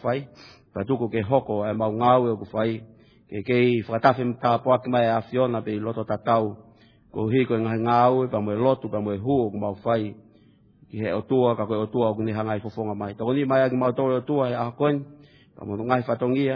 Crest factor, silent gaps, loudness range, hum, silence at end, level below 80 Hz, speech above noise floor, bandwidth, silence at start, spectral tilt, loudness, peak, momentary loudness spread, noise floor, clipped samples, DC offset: 22 dB; none; 3 LU; none; 0 s; -62 dBFS; 33 dB; 5.4 kHz; 0 s; -9.5 dB/octave; -24 LUFS; -2 dBFS; 10 LU; -56 dBFS; under 0.1%; under 0.1%